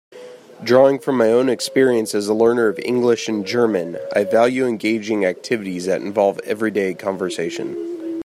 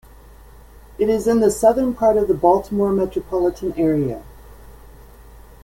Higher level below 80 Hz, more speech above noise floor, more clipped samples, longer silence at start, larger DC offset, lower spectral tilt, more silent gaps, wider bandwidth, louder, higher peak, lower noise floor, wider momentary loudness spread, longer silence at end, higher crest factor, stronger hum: second, -66 dBFS vs -42 dBFS; second, 21 dB vs 26 dB; neither; second, 0.1 s vs 1 s; neither; second, -5 dB/octave vs -7 dB/octave; neither; second, 15 kHz vs 17 kHz; about the same, -19 LUFS vs -18 LUFS; about the same, -2 dBFS vs -2 dBFS; second, -39 dBFS vs -43 dBFS; about the same, 8 LU vs 7 LU; second, 0 s vs 0.25 s; about the same, 16 dB vs 18 dB; neither